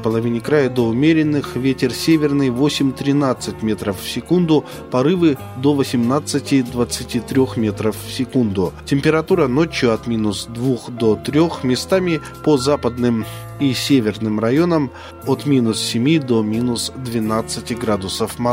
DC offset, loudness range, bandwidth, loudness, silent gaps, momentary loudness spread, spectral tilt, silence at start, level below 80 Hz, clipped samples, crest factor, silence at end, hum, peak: under 0.1%; 2 LU; 16 kHz; -18 LUFS; none; 7 LU; -6 dB/octave; 0 s; -44 dBFS; under 0.1%; 16 dB; 0 s; none; -2 dBFS